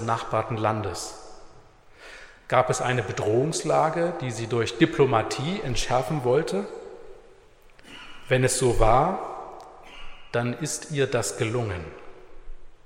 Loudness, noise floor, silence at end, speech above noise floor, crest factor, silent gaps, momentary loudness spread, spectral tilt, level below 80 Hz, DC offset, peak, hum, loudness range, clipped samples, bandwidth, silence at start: -25 LUFS; -52 dBFS; 0.1 s; 28 dB; 22 dB; none; 23 LU; -5 dB/octave; -38 dBFS; under 0.1%; -4 dBFS; none; 5 LU; under 0.1%; 16 kHz; 0 s